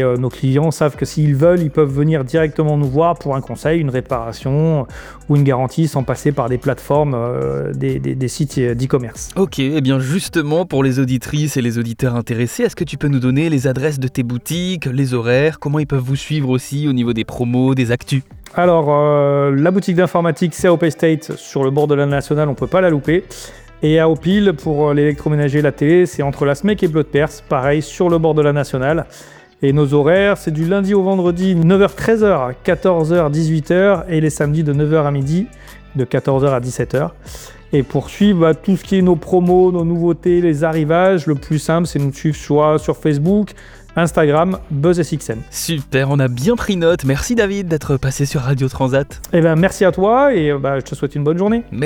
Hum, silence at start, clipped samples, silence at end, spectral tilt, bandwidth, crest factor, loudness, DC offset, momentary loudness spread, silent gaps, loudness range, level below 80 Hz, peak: none; 0 s; under 0.1%; 0 s; -7 dB/octave; 19 kHz; 14 dB; -16 LUFS; under 0.1%; 7 LU; none; 3 LU; -40 dBFS; -2 dBFS